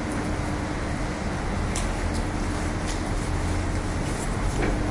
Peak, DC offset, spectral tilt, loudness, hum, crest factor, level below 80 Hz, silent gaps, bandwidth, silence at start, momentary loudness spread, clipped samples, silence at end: -10 dBFS; under 0.1%; -5.5 dB/octave; -28 LUFS; none; 16 dB; -32 dBFS; none; 11.5 kHz; 0 s; 2 LU; under 0.1%; 0 s